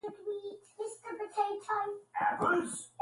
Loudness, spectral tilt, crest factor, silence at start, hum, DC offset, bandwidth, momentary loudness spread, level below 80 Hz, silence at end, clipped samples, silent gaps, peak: -35 LUFS; -4 dB/octave; 18 dB; 0.05 s; none; under 0.1%; 11.5 kHz; 12 LU; -74 dBFS; 0.15 s; under 0.1%; none; -18 dBFS